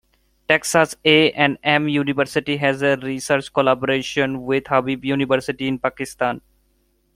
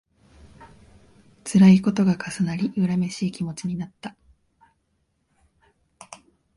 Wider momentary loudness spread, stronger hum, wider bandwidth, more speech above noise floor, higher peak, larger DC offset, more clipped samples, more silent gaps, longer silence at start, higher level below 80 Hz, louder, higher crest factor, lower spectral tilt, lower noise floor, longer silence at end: second, 9 LU vs 25 LU; neither; first, 15.5 kHz vs 11.5 kHz; second, 44 dB vs 50 dB; first, -2 dBFS vs -6 dBFS; neither; neither; neither; about the same, 0.5 s vs 0.6 s; about the same, -56 dBFS vs -58 dBFS; about the same, -19 LUFS vs -21 LUFS; about the same, 18 dB vs 20 dB; second, -4.5 dB/octave vs -7 dB/octave; second, -64 dBFS vs -71 dBFS; first, 0.75 s vs 0.4 s